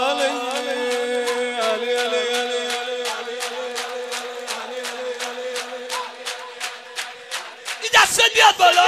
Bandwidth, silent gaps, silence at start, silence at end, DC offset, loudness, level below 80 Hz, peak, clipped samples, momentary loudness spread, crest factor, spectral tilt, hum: 16 kHz; none; 0 s; 0 s; under 0.1%; -21 LUFS; -64 dBFS; -2 dBFS; under 0.1%; 17 LU; 20 dB; 0.5 dB/octave; none